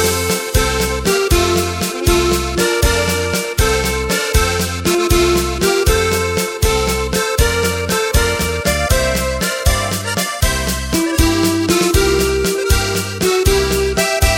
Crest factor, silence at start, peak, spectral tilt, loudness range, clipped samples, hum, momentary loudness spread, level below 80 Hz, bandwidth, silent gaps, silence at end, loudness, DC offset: 14 dB; 0 s; 0 dBFS; -4 dB/octave; 1 LU; under 0.1%; none; 4 LU; -22 dBFS; 17 kHz; none; 0 s; -15 LUFS; under 0.1%